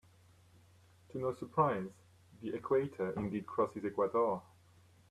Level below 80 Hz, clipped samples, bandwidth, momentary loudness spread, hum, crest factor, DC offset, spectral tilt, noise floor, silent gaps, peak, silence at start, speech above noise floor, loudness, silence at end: -70 dBFS; under 0.1%; 13 kHz; 11 LU; none; 20 dB; under 0.1%; -8.5 dB/octave; -64 dBFS; none; -18 dBFS; 1.15 s; 29 dB; -36 LUFS; 0.7 s